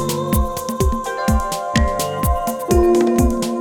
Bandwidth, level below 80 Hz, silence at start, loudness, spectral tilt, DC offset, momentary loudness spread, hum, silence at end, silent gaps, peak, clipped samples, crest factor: 18 kHz; -24 dBFS; 0 s; -18 LUFS; -5.5 dB/octave; under 0.1%; 6 LU; none; 0 s; none; -4 dBFS; under 0.1%; 14 dB